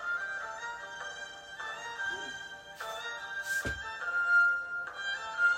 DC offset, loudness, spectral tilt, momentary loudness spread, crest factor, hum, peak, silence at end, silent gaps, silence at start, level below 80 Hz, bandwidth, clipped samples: under 0.1%; -33 LUFS; -1.5 dB/octave; 16 LU; 16 dB; none; -18 dBFS; 0 s; none; 0 s; -60 dBFS; 16 kHz; under 0.1%